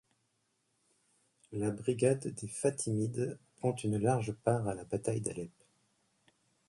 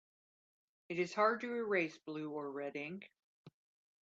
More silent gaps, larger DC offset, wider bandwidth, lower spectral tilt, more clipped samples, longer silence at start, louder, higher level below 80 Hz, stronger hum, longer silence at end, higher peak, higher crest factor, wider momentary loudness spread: second, none vs 3.24-3.45 s; neither; first, 11.5 kHz vs 8 kHz; about the same, -6.5 dB/octave vs -5.5 dB/octave; neither; first, 1.5 s vs 0.9 s; first, -34 LUFS vs -38 LUFS; first, -66 dBFS vs -88 dBFS; neither; first, 1.2 s vs 0.55 s; first, -14 dBFS vs -20 dBFS; about the same, 22 dB vs 22 dB; second, 9 LU vs 12 LU